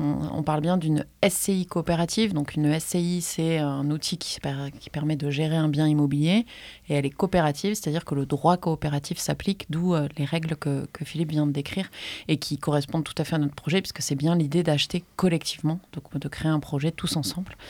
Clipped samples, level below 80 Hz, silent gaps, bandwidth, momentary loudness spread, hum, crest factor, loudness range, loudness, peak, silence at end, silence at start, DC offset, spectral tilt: under 0.1%; -52 dBFS; none; 17 kHz; 7 LU; none; 18 dB; 3 LU; -26 LUFS; -6 dBFS; 0 s; 0 s; under 0.1%; -5.5 dB/octave